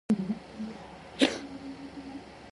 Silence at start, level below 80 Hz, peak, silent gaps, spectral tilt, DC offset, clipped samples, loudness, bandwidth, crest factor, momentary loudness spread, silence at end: 0.1 s; -60 dBFS; -8 dBFS; none; -4.5 dB/octave; under 0.1%; under 0.1%; -33 LUFS; 11.5 kHz; 26 dB; 17 LU; 0 s